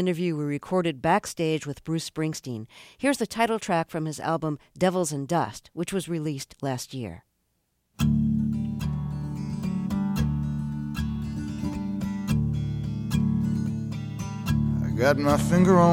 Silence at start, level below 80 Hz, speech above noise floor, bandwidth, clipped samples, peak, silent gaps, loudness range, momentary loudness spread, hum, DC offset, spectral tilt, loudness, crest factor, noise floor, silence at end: 0 s; -42 dBFS; 48 dB; 16.5 kHz; under 0.1%; -6 dBFS; none; 3 LU; 9 LU; none; under 0.1%; -6.5 dB/octave; -27 LUFS; 20 dB; -73 dBFS; 0 s